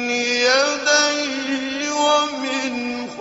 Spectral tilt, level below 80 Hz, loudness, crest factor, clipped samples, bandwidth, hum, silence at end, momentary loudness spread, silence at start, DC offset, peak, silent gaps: -0.5 dB/octave; -64 dBFS; -19 LUFS; 16 dB; under 0.1%; 8 kHz; none; 0 s; 8 LU; 0 s; under 0.1%; -4 dBFS; none